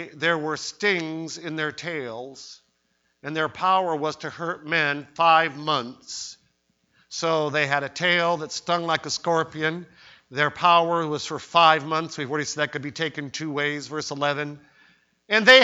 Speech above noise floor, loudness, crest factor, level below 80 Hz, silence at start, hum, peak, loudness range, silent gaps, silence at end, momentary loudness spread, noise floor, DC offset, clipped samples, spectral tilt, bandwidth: 47 dB; -23 LUFS; 24 dB; -68 dBFS; 0 s; none; 0 dBFS; 6 LU; none; 0 s; 16 LU; -70 dBFS; under 0.1%; under 0.1%; -3.5 dB/octave; 8 kHz